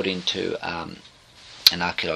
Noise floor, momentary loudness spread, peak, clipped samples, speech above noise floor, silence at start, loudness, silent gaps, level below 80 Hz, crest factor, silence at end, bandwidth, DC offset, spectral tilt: -47 dBFS; 15 LU; 0 dBFS; under 0.1%; 19 dB; 0 s; -21 LUFS; none; -56 dBFS; 26 dB; 0 s; 14.5 kHz; under 0.1%; -2.5 dB/octave